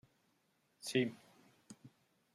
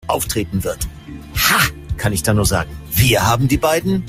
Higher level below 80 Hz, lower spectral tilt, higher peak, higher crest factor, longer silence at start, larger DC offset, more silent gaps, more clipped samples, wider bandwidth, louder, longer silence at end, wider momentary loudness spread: second, -84 dBFS vs -32 dBFS; about the same, -4.5 dB/octave vs -4 dB/octave; second, -20 dBFS vs 0 dBFS; first, 24 dB vs 16 dB; first, 0.85 s vs 0.05 s; neither; neither; neither; second, 14 kHz vs 16 kHz; second, -39 LUFS vs -17 LUFS; first, 0.45 s vs 0 s; first, 24 LU vs 12 LU